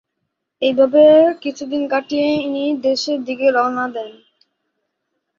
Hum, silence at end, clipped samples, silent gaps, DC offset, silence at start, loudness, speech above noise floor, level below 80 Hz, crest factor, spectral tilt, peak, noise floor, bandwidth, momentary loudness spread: none; 1.25 s; under 0.1%; none; under 0.1%; 0.6 s; -16 LUFS; 60 dB; -64 dBFS; 16 dB; -4.5 dB/octave; -2 dBFS; -75 dBFS; 7.4 kHz; 13 LU